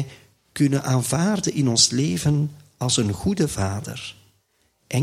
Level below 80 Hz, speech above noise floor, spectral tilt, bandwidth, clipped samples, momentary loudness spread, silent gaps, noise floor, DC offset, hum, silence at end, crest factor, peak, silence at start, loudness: -48 dBFS; 45 dB; -4.5 dB/octave; 15.5 kHz; under 0.1%; 16 LU; none; -66 dBFS; under 0.1%; none; 0 s; 20 dB; -2 dBFS; 0 s; -21 LUFS